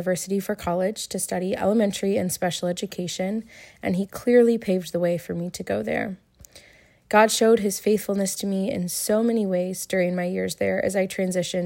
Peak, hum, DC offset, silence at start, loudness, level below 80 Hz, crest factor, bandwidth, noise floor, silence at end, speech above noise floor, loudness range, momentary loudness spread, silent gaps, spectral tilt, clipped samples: -4 dBFS; none; under 0.1%; 0 s; -24 LUFS; -58 dBFS; 20 dB; 16.5 kHz; -54 dBFS; 0 s; 31 dB; 3 LU; 10 LU; none; -4.5 dB/octave; under 0.1%